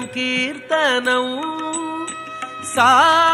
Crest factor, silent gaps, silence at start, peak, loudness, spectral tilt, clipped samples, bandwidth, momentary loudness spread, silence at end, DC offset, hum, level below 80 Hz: 16 dB; none; 0 s; -2 dBFS; -17 LUFS; -2 dB/octave; under 0.1%; 16 kHz; 16 LU; 0 s; under 0.1%; none; -62 dBFS